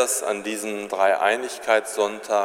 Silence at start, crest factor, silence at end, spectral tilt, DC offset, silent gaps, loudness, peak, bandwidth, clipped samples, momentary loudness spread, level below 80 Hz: 0 s; 18 dB; 0 s; -1.5 dB/octave; under 0.1%; none; -23 LUFS; -4 dBFS; 16.5 kHz; under 0.1%; 8 LU; -72 dBFS